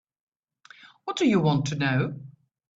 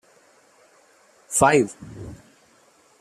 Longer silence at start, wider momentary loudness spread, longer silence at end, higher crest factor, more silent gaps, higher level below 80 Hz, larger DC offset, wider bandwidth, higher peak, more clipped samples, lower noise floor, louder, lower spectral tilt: second, 0.85 s vs 1.3 s; second, 15 LU vs 23 LU; second, 0.5 s vs 0.85 s; second, 18 dB vs 24 dB; neither; second, -64 dBFS vs -56 dBFS; neither; second, 8 kHz vs 15 kHz; second, -10 dBFS vs -2 dBFS; neither; about the same, -55 dBFS vs -57 dBFS; second, -25 LUFS vs -20 LUFS; first, -6 dB/octave vs -4 dB/octave